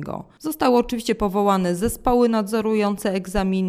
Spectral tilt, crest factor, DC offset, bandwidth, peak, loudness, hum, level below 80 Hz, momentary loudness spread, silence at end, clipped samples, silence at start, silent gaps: -6 dB/octave; 16 dB; under 0.1%; 16 kHz; -4 dBFS; -21 LUFS; none; -38 dBFS; 6 LU; 0 s; under 0.1%; 0 s; none